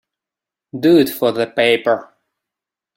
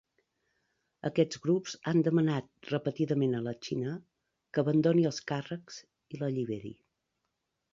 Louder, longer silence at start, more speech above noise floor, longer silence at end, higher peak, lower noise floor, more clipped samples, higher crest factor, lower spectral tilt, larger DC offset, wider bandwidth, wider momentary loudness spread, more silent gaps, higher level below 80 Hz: first, -16 LUFS vs -31 LUFS; second, 0.75 s vs 1.05 s; first, 72 dB vs 53 dB; about the same, 0.95 s vs 1 s; first, -2 dBFS vs -12 dBFS; first, -87 dBFS vs -83 dBFS; neither; about the same, 16 dB vs 20 dB; second, -5.5 dB/octave vs -7 dB/octave; neither; first, 16.5 kHz vs 7.6 kHz; second, 8 LU vs 15 LU; neither; first, -62 dBFS vs -72 dBFS